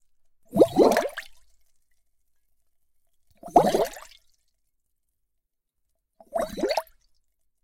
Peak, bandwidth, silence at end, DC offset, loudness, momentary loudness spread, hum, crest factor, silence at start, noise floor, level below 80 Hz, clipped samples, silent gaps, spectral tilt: -4 dBFS; 16.5 kHz; 0.8 s; under 0.1%; -24 LUFS; 15 LU; none; 24 dB; 0.55 s; -78 dBFS; -54 dBFS; under 0.1%; none; -5 dB/octave